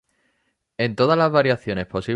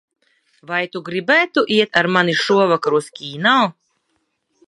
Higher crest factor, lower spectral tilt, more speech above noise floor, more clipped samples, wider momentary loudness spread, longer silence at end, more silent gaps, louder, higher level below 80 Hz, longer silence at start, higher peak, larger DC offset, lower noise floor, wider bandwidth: about the same, 18 dB vs 18 dB; first, -7 dB/octave vs -4.5 dB/octave; about the same, 51 dB vs 52 dB; neither; about the same, 9 LU vs 9 LU; second, 0 s vs 0.95 s; neither; second, -20 LUFS vs -17 LUFS; first, -52 dBFS vs -66 dBFS; about the same, 0.8 s vs 0.7 s; second, -4 dBFS vs 0 dBFS; neither; about the same, -70 dBFS vs -69 dBFS; about the same, 10.5 kHz vs 11.5 kHz